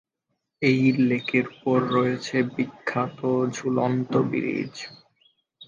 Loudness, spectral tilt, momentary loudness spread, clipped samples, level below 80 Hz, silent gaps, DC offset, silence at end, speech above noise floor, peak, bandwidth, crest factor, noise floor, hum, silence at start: -24 LUFS; -6.5 dB/octave; 8 LU; under 0.1%; -68 dBFS; none; under 0.1%; 0.05 s; 55 dB; -6 dBFS; 7.4 kHz; 18 dB; -79 dBFS; none; 0.6 s